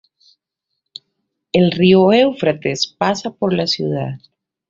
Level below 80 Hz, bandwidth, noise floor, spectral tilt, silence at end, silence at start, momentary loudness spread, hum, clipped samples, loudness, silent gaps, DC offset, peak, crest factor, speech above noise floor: -56 dBFS; 7.6 kHz; -78 dBFS; -6 dB/octave; 0.5 s; 1.55 s; 11 LU; none; under 0.1%; -16 LUFS; none; under 0.1%; -2 dBFS; 16 dB; 62 dB